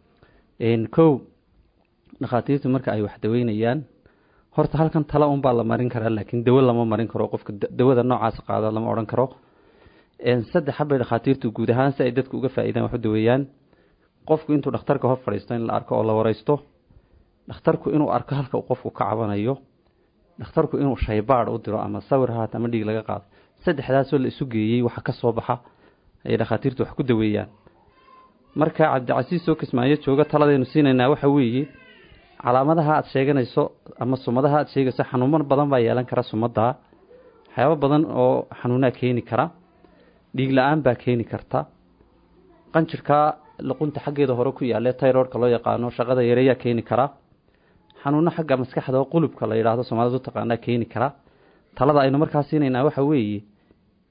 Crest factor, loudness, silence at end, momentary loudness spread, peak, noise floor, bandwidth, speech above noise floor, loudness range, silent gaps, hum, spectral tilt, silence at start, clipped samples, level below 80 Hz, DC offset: 18 dB; -22 LUFS; 0.7 s; 8 LU; -4 dBFS; -62 dBFS; 5.2 kHz; 41 dB; 4 LU; none; none; -12.5 dB/octave; 0.6 s; under 0.1%; -50 dBFS; under 0.1%